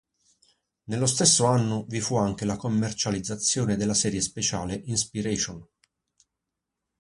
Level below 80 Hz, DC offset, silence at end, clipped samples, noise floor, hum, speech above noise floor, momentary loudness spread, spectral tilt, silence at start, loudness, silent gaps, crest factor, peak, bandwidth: -54 dBFS; under 0.1%; 1.35 s; under 0.1%; -85 dBFS; none; 59 dB; 9 LU; -4 dB/octave; 0.9 s; -25 LUFS; none; 22 dB; -4 dBFS; 11.5 kHz